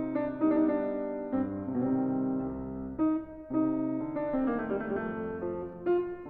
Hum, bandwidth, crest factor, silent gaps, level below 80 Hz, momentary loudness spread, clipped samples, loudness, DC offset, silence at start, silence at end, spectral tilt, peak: none; 3.9 kHz; 14 dB; none; -56 dBFS; 7 LU; under 0.1%; -31 LUFS; under 0.1%; 0 s; 0 s; -11.5 dB/octave; -16 dBFS